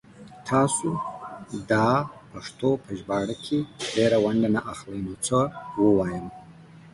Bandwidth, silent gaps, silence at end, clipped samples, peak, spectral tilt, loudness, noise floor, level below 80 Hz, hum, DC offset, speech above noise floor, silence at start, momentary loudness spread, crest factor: 11.5 kHz; none; 0.05 s; under 0.1%; -8 dBFS; -5.5 dB/octave; -25 LUFS; -48 dBFS; -54 dBFS; none; under 0.1%; 23 dB; 0.15 s; 15 LU; 18 dB